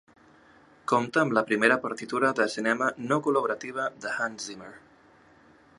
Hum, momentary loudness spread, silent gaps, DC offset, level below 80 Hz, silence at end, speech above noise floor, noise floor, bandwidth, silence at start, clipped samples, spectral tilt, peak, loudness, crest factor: none; 14 LU; none; under 0.1%; -72 dBFS; 1 s; 31 dB; -57 dBFS; 11.5 kHz; 0.9 s; under 0.1%; -4.5 dB/octave; -4 dBFS; -26 LUFS; 24 dB